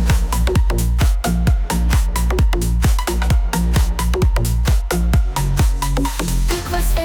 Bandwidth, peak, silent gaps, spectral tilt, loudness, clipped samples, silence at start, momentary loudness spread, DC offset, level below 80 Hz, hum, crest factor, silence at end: 19 kHz; -6 dBFS; none; -5.5 dB/octave; -18 LUFS; under 0.1%; 0 s; 3 LU; under 0.1%; -16 dBFS; none; 10 dB; 0 s